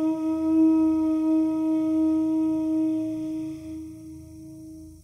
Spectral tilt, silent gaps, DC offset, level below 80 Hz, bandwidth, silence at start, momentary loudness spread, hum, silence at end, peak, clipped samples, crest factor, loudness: -8 dB/octave; none; under 0.1%; -56 dBFS; 9.4 kHz; 0 s; 22 LU; none; 0.05 s; -12 dBFS; under 0.1%; 12 dB; -24 LUFS